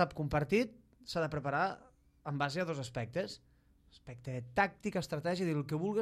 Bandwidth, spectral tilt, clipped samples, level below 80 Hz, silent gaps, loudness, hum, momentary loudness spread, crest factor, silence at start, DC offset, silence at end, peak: 14.5 kHz; -6 dB/octave; under 0.1%; -60 dBFS; none; -36 LUFS; none; 15 LU; 20 dB; 0 s; under 0.1%; 0 s; -16 dBFS